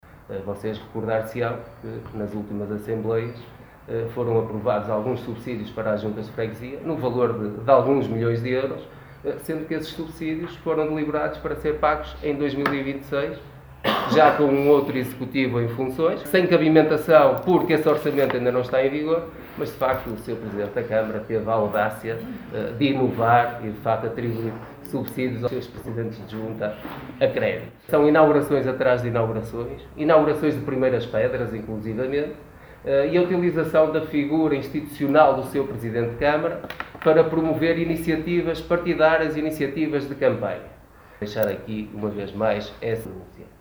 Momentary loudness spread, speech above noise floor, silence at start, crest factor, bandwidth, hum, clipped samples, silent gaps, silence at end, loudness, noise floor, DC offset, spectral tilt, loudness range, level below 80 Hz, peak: 14 LU; 25 dB; 0.15 s; 22 dB; over 20 kHz; none; under 0.1%; none; 0.15 s; -23 LUFS; -48 dBFS; under 0.1%; -7.5 dB/octave; 8 LU; -50 dBFS; 0 dBFS